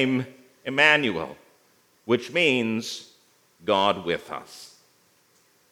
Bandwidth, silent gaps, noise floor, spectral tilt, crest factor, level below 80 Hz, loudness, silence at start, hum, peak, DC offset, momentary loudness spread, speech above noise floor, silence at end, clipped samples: 17 kHz; none; -62 dBFS; -4 dB/octave; 22 dB; -72 dBFS; -23 LUFS; 0 s; none; -4 dBFS; under 0.1%; 20 LU; 38 dB; 1.05 s; under 0.1%